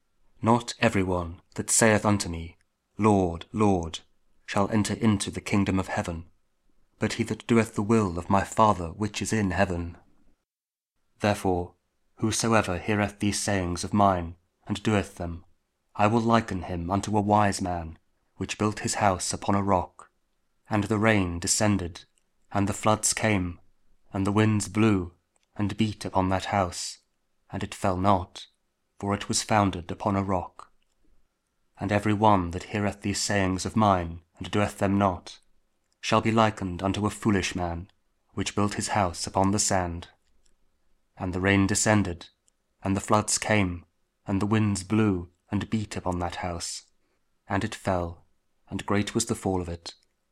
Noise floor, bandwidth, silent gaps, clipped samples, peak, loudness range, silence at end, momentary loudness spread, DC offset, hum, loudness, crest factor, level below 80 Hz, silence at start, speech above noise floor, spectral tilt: under -90 dBFS; 15 kHz; none; under 0.1%; -4 dBFS; 4 LU; 0.4 s; 14 LU; under 0.1%; none; -26 LUFS; 22 dB; -50 dBFS; 0.4 s; over 64 dB; -5 dB/octave